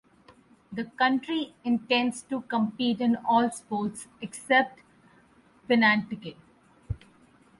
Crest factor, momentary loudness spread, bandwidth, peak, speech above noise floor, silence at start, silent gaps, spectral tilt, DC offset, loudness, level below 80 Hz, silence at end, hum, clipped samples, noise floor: 20 dB; 17 LU; 11.5 kHz; -8 dBFS; 33 dB; 0.7 s; none; -4.5 dB/octave; under 0.1%; -26 LUFS; -54 dBFS; 0.65 s; none; under 0.1%; -59 dBFS